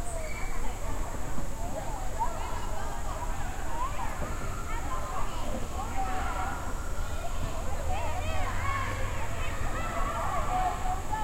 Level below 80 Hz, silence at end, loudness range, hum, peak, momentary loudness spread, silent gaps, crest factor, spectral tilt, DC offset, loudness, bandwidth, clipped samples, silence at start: -34 dBFS; 0 s; 4 LU; none; -16 dBFS; 6 LU; none; 12 dB; -4.5 dB/octave; under 0.1%; -35 LUFS; 16 kHz; under 0.1%; 0 s